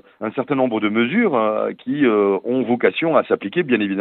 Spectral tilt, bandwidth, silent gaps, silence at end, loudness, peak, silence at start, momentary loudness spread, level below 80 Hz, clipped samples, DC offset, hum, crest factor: -10 dB/octave; 4.1 kHz; none; 0 s; -19 LUFS; -2 dBFS; 0.2 s; 6 LU; -72 dBFS; under 0.1%; under 0.1%; none; 16 dB